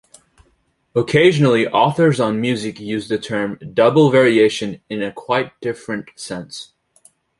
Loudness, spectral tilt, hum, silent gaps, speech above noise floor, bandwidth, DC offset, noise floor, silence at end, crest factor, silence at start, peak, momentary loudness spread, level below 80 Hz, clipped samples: -17 LUFS; -6 dB/octave; none; none; 46 dB; 11.5 kHz; under 0.1%; -62 dBFS; 0.75 s; 16 dB; 0.95 s; -2 dBFS; 15 LU; -58 dBFS; under 0.1%